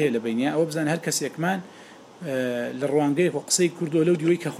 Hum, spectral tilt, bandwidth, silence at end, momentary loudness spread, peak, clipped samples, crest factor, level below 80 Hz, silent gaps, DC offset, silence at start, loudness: none; -4.5 dB/octave; 15 kHz; 0 s; 7 LU; -6 dBFS; under 0.1%; 18 dB; -74 dBFS; none; under 0.1%; 0 s; -24 LUFS